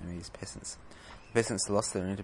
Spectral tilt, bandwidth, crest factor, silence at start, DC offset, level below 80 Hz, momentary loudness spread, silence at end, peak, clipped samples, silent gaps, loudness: -4 dB/octave; 11.5 kHz; 22 dB; 0 s; under 0.1%; -58 dBFS; 18 LU; 0 s; -12 dBFS; under 0.1%; none; -33 LUFS